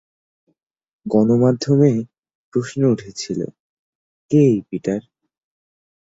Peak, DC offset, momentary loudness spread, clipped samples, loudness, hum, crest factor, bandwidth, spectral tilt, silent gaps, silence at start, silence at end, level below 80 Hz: -2 dBFS; under 0.1%; 12 LU; under 0.1%; -19 LUFS; none; 18 dB; 8 kHz; -7.5 dB/octave; 2.18-2.23 s, 2.35-2.52 s, 3.60-4.29 s; 1.05 s; 1.15 s; -60 dBFS